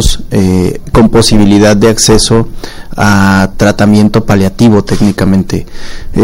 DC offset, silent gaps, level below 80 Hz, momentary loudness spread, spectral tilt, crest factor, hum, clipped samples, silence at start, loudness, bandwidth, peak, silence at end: under 0.1%; none; -20 dBFS; 12 LU; -5 dB/octave; 6 dB; none; 2%; 0 s; -8 LUFS; 16.5 kHz; 0 dBFS; 0 s